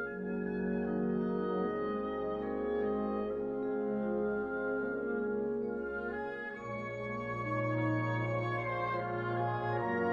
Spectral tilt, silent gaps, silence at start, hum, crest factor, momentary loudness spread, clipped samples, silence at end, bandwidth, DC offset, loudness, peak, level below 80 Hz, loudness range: -9 dB/octave; none; 0 s; none; 14 dB; 5 LU; under 0.1%; 0 s; 7 kHz; under 0.1%; -35 LUFS; -22 dBFS; -60 dBFS; 2 LU